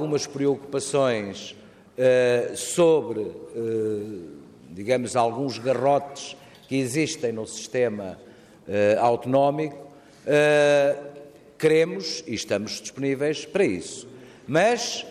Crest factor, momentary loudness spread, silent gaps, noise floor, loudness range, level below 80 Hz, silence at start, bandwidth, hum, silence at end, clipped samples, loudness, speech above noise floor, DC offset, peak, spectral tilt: 16 dB; 17 LU; none; -45 dBFS; 4 LU; -66 dBFS; 0 s; 15 kHz; none; 0 s; under 0.1%; -24 LUFS; 22 dB; under 0.1%; -8 dBFS; -4.5 dB/octave